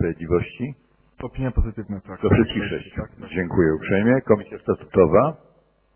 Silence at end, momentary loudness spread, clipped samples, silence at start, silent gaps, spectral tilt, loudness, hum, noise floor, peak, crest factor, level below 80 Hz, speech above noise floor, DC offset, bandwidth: 0.6 s; 15 LU; under 0.1%; 0 s; none; -11.5 dB/octave; -22 LUFS; none; -59 dBFS; -2 dBFS; 20 dB; -34 dBFS; 38 dB; under 0.1%; 3.3 kHz